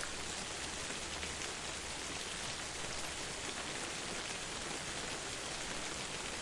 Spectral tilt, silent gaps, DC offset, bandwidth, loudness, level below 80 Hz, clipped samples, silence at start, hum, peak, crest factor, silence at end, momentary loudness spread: -1.5 dB/octave; none; under 0.1%; 12 kHz; -40 LUFS; -58 dBFS; under 0.1%; 0 s; none; -24 dBFS; 18 dB; 0 s; 1 LU